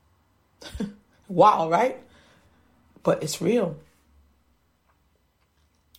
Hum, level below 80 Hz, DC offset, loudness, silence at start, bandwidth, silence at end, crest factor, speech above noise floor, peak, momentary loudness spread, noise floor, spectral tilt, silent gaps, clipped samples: none; -56 dBFS; under 0.1%; -23 LUFS; 0.6 s; 16.5 kHz; 2.2 s; 22 dB; 46 dB; -6 dBFS; 24 LU; -67 dBFS; -5.5 dB/octave; none; under 0.1%